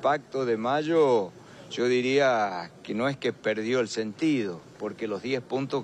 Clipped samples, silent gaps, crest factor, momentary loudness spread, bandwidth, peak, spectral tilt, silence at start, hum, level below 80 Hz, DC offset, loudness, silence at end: under 0.1%; none; 14 dB; 12 LU; 10 kHz; -12 dBFS; -5.5 dB/octave; 0 s; none; -72 dBFS; under 0.1%; -27 LUFS; 0 s